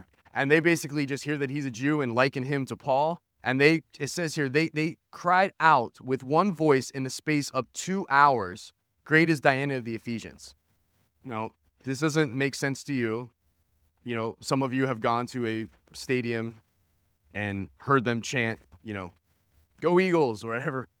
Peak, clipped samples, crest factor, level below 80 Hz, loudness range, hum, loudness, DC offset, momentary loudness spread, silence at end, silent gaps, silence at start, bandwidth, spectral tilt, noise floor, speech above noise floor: -2 dBFS; under 0.1%; 26 dB; -68 dBFS; 6 LU; none; -27 LUFS; under 0.1%; 15 LU; 0.15 s; none; 0.35 s; 17 kHz; -5.5 dB/octave; -71 dBFS; 44 dB